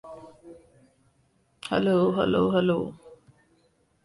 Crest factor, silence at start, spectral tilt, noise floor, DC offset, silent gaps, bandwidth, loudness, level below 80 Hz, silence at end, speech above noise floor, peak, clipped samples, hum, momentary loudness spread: 18 dB; 0.05 s; -7.5 dB/octave; -67 dBFS; under 0.1%; none; 11.5 kHz; -24 LUFS; -58 dBFS; 0.9 s; 44 dB; -10 dBFS; under 0.1%; none; 20 LU